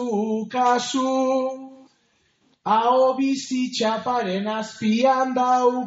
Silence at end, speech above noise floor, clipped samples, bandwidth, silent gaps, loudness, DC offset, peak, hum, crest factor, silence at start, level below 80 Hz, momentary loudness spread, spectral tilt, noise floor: 0 s; 44 dB; under 0.1%; 8 kHz; none; -21 LUFS; under 0.1%; -8 dBFS; none; 14 dB; 0 s; -72 dBFS; 7 LU; -3.5 dB/octave; -65 dBFS